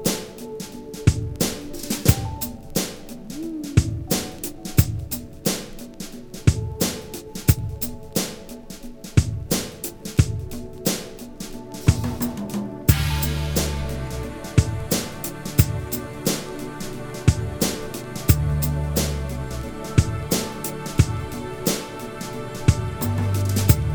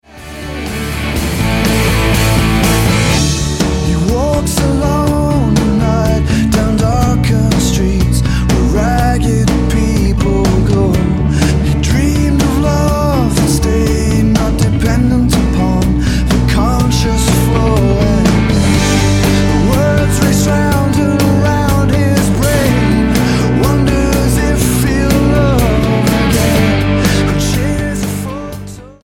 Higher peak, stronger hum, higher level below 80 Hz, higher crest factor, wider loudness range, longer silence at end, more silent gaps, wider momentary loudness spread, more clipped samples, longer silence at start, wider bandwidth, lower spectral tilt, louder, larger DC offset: about the same, 0 dBFS vs 0 dBFS; neither; second, -32 dBFS vs -18 dBFS; first, 22 dB vs 10 dB; about the same, 2 LU vs 1 LU; second, 0 s vs 0.15 s; neither; first, 12 LU vs 3 LU; neither; second, 0 s vs 0.15 s; first, over 20 kHz vs 17.5 kHz; about the same, -5 dB/octave vs -5.5 dB/octave; second, -24 LUFS vs -12 LUFS; second, under 0.1% vs 0.1%